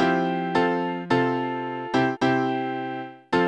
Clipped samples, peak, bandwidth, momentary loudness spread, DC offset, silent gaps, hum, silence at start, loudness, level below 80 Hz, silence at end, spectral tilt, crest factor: under 0.1%; -8 dBFS; 9 kHz; 8 LU; under 0.1%; none; none; 0 s; -24 LUFS; -62 dBFS; 0 s; -6.5 dB/octave; 16 dB